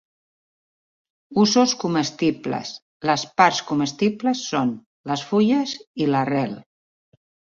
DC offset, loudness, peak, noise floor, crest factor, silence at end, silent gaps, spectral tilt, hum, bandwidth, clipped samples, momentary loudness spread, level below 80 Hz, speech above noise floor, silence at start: under 0.1%; -21 LUFS; -2 dBFS; under -90 dBFS; 20 dB; 0.95 s; 2.82-3.00 s, 4.86-5.04 s, 5.87-5.94 s; -4.5 dB/octave; none; 7.6 kHz; under 0.1%; 11 LU; -64 dBFS; over 69 dB; 1.3 s